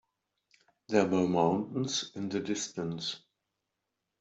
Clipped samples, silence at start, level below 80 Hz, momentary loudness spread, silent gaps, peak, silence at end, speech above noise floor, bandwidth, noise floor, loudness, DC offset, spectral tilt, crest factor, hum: under 0.1%; 0.9 s; -72 dBFS; 9 LU; none; -10 dBFS; 1.05 s; 55 dB; 8.2 kHz; -85 dBFS; -31 LUFS; under 0.1%; -4.5 dB/octave; 22 dB; none